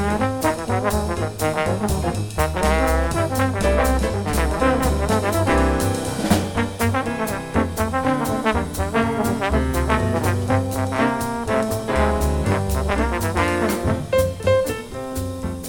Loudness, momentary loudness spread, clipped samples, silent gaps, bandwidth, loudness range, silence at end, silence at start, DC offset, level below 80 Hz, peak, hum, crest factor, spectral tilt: -21 LUFS; 4 LU; under 0.1%; none; 18 kHz; 2 LU; 0 s; 0 s; under 0.1%; -28 dBFS; -2 dBFS; none; 18 dB; -5.5 dB/octave